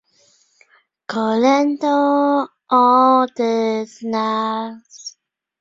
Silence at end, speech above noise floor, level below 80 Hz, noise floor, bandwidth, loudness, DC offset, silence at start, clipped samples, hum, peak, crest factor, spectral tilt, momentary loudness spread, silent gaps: 0.5 s; 41 dB; -68 dBFS; -58 dBFS; 7.6 kHz; -17 LUFS; under 0.1%; 1.1 s; under 0.1%; none; -2 dBFS; 16 dB; -5 dB/octave; 20 LU; none